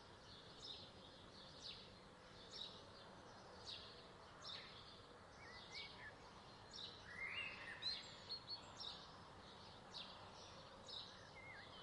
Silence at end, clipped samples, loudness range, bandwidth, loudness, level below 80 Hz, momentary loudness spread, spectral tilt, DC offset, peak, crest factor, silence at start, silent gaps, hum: 0 s; under 0.1%; 6 LU; 11 kHz; -54 LUFS; -76 dBFS; 12 LU; -2.5 dB/octave; under 0.1%; -36 dBFS; 20 dB; 0 s; none; none